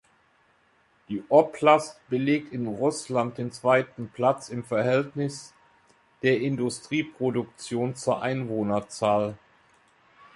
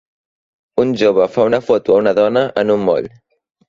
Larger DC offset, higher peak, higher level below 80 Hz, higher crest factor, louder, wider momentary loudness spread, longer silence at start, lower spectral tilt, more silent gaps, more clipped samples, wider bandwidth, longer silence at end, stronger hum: neither; second, -4 dBFS vs 0 dBFS; second, -66 dBFS vs -54 dBFS; first, 22 dB vs 14 dB; second, -26 LUFS vs -15 LUFS; first, 11 LU vs 6 LU; first, 1.1 s vs 0.75 s; about the same, -6 dB/octave vs -6.5 dB/octave; neither; neither; first, 11.5 kHz vs 7.4 kHz; first, 1 s vs 0.6 s; neither